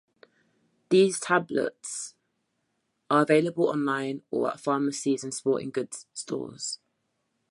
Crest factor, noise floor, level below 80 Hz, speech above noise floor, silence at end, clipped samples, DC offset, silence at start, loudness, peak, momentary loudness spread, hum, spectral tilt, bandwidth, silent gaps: 20 dB; -77 dBFS; -76 dBFS; 50 dB; 0.75 s; under 0.1%; under 0.1%; 0.9 s; -27 LUFS; -8 dBFS; 13 LU; none; -4.5 dB/octave; 11.5 kHz; none